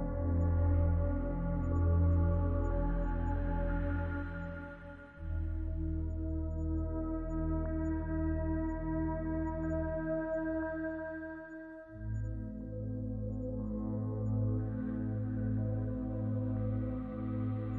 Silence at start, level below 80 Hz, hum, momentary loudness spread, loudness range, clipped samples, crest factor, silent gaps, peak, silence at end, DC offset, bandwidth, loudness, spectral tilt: 0 s; -40 dBFS; none; 11 LU; 6 LU; under 0.1%; 14 dB; none; -20 dBFS; 0 s; under 0.1%; 3.1 kHz; -36 LUFS; -11.5 dB/octave